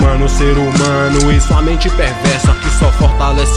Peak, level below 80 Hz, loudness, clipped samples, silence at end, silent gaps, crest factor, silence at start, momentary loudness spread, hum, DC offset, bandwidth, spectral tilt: 0 dBFS; -12 dBFS; -12 LUFS; under 0.1%; 0 s; none; 10 dB; 0 s; 3 LU; none; under 0.1%; 11 kHz; -5.5 dB/octave